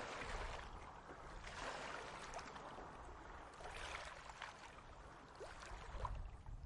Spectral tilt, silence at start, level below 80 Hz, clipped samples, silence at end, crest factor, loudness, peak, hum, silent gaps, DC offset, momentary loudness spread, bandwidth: -3.5 dB/octave; 0 s; -58 dBFS; under 0.1%; 0 s; 20 dB; -52 LUFS; -32 dBFS; none; none; under 0.1%; 8 LU; 11.5 kHz